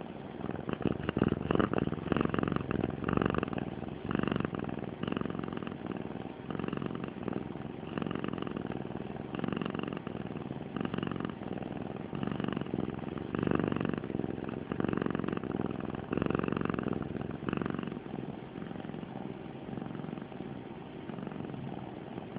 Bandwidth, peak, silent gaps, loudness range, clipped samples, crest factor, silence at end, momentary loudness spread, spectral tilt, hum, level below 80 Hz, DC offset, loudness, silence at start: 4.9 kHz; -12 dBFS; none; 7 LU; under 0.1%; 24 dB; 0 s; 10 LU; -6.5 dB/octave; none; -54 dBFS; under 0.1%; -36 LUFS; 0 s